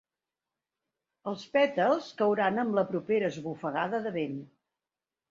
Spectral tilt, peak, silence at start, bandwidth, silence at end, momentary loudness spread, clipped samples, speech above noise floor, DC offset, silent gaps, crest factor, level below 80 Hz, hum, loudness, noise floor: -6.5 dB/octave; -12 dBFS; 1.25 s; 7.6 kHz; 0.85 s; 12 LU; under 0.1%; over 61 dB; under 0.1%; none; 18 dB; -76 dBFS; none; -29 LUFS; under -90 dBFS